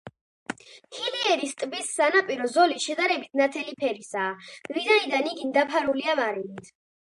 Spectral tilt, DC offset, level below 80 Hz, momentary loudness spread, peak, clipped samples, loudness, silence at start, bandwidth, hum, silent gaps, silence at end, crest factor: -2 dB/octave; under 0.1%; -74 dBFS; 17 LU; -6 dBFS; under 0.1%; -25 LUFS; 0.05 s; 11.5 kHz; none; 0.21-0.46 s; 0.35 s; 20 dB